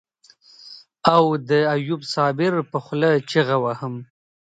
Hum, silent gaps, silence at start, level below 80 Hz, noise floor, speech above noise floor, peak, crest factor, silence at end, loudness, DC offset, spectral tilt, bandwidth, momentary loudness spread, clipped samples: none; none; 0.65 s; -66 dBFS; -53 dBFS; 34 dB; 0 dBFS; 22 dB; 0.45 s; -20 LUFS; under 0.1%; -6.5 dB/octave; 9.2 kHz; 16 LU; under 0.1%